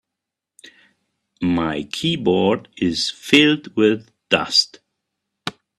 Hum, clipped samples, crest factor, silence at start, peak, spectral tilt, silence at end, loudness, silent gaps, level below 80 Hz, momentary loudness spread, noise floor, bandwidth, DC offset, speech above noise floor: none; under 0.1%; 20 dB; 1.4 s; 0 dBFS; -4 dB/octave; 0.3 s; -18 LUFS; none; -56 dBFS; 14 LU; -84 dBFS; 13 kHz; under 0.1%; 65 dB